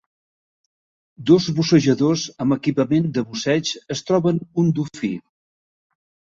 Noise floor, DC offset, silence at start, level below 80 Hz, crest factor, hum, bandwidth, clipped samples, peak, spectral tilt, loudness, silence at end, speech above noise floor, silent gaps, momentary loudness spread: under -90 dBFS; under 0.1%; 1.2 s; -58 dBFS; 18 dB; none; 7.8 kHz; under 0.1%; -2 dBFS; -6 dB/octave; -20 LUFS; 1.2 s; over 71 dB; none; 11 LU